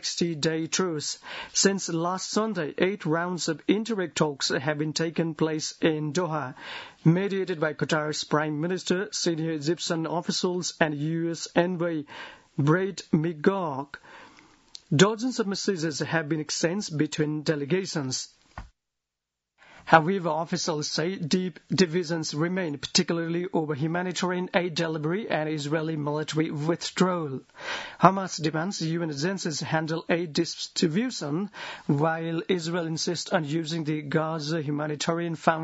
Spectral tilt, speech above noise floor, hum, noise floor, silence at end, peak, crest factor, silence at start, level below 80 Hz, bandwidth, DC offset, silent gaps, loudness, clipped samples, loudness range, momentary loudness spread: -4.5 dB/octave; 60 dB; none; -86 dBFS; 0 s; 0 dBFS; 28 dB; 0 s; -64 dBFS; 8 kHz; under 0.1%; none; -27 LUFS; under 0.1%; 2 LU; 7 LU